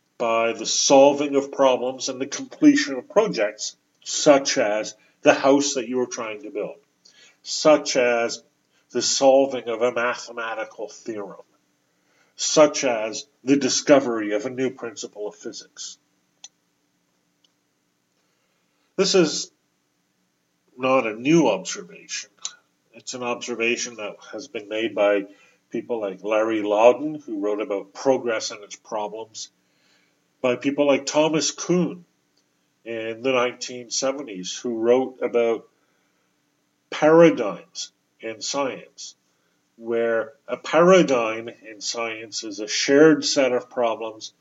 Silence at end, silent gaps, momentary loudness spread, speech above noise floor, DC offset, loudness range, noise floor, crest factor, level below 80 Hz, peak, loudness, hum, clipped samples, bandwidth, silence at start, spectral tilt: 0.1 s; none; 17 LU; 49 dB; under 0.1%; 7 LU; -70 dBFS; 22 dB; -84 dBFS; 0 dBFS; -21 LUFS; none; under 0.1%; 8 kHz; 0.2 s; -3.5 dB/octave